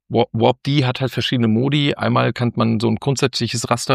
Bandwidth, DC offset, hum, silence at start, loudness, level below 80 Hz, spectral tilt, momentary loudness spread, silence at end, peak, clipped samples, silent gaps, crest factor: 14.5 kHz; under 0.1%; none; 0.1 s; -18 LUFS; -54 dBFS; -5.5 dB/octave; 3 LU; 0 s; -2 dBFS; under 0.1%; none; 16 dB